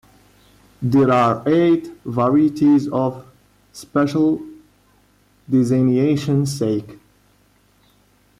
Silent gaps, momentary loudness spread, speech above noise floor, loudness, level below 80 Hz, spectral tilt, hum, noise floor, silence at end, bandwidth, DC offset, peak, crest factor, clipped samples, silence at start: none; 11 LU; 40 dB; -18 LUFS; -56 dBFS; -7.5 dB/octave; 50 Hz at -60 dBFS; -57 dBFS; 1.45 s; 14 kHz; under 0.1%; -6 dBFS; 12 dB; under 0.1%; 0.8 s